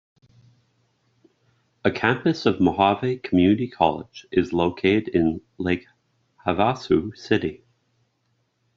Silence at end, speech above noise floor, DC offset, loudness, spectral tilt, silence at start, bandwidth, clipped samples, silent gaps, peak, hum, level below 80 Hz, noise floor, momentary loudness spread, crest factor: 1.2 s; 49 dB; under 0.1%; -22 LUFS; -5 dB/octave; 1.85 s; 7.4 kHz; under 0.1%; none; -4 dBFS; none; -56 dBFS; -70 dBFS; 7 LU; 20 dB